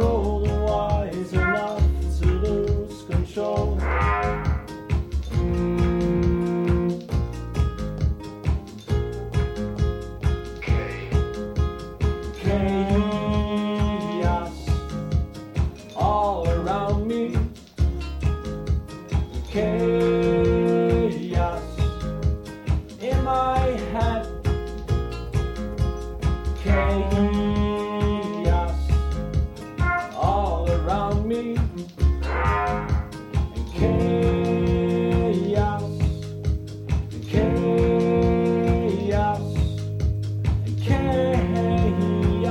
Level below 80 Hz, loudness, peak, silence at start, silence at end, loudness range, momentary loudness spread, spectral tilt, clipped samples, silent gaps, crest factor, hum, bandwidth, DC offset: -28 dBFS; -24 LUFS; -6 dBFS; 0 s; 0 s; 4 LU; 7 LU; -8 dB/octave; under 0.1%; none; 16 dB; none; 10.5 kHz; under 0.1%